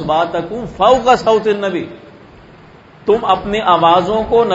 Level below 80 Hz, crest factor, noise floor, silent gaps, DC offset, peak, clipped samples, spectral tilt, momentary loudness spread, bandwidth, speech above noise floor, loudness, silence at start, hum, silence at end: -42 dBFS; 14 dB; -41 dBFS; none; under 0.1%; 0 dBFS; under 0.1%; -5.5 dB/octave; 13 LU; 8 kHz; 28 dB; -14 LUFS; 0 s; none; 0 s